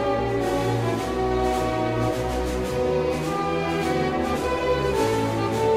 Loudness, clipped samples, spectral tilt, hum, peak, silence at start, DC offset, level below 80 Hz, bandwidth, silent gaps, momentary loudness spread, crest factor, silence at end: -24 LUFS; under 0.1%; -6 dB/octave; none; -10 dBFS; 0 s; under 0.1%; -38 dBFS; 16 kHz; none; 2 LU; 14 dB; 0 s